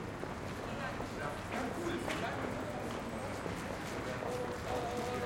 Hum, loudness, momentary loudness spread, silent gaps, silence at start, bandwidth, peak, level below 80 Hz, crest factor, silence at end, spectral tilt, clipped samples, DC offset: none; -39 LUFS; 4 LU; none; 0 s; 16.5 kHz; -24 dBFS; -56 dBFS; 16 dB; 0 s; -5 dB/octave; under 0.1%; under 0.1%